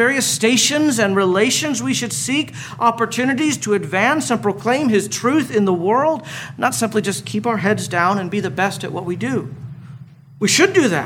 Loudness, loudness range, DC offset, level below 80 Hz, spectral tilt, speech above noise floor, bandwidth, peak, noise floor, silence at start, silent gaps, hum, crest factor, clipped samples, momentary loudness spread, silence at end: -17 LUFS; 3 LU; under 0.1%; -60 dBFS; -3.5 dB/octave; 21 dB; 17 kHz; -2 dBFS; -39 dBFS; 0 s; none; none; 16 dB; under 0.1%; 9 LU; 0 s